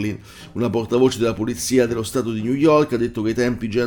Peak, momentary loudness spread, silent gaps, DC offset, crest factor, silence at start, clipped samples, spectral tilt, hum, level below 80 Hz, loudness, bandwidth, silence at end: -4 dBFS; 9 LU; none; under 0.1%; 16 dB; 0 s; under 0.1%; -5.5 dB/octave; none; -46 dBFS; -20 LUFS; 19 kHz; 0 s